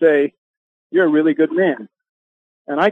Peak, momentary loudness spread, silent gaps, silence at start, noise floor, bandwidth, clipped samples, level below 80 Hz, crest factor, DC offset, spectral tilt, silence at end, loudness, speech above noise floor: -2 dBFS; 10 LU; 0.38-0.90 s, 2.09-2.65 s; 0 s; under -90 dBFS; 4.6 kHz; under 0.1%; -68 dBFS; 14 dB; under 0.1%; -8 dB/octave; 0 s; -17 LUFS; over 75 dB